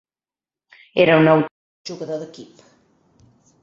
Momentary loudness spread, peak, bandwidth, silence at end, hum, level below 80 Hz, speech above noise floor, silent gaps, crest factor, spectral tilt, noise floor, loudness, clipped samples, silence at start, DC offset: 22 LU; -2 dBFS; 7.4 kHz; 1.2 s; none; -64 dBFS; over 73 dB; 1.51-1.85 s; 20 dB; -7 dB/octave; under -90 dBFS; -18 LUFS; under 0.1%; 0.95 s; under 0.1%